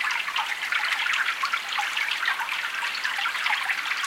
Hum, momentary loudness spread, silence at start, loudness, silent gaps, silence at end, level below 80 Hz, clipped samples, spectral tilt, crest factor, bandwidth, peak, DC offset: none; 3 LU; 0 s; -25 LUFS; none; 0 s; -72 dBFS; under 0.1%; 2.5 dB/octave; 18 dB; 17 kHz; -10 dBFS; under 0.1%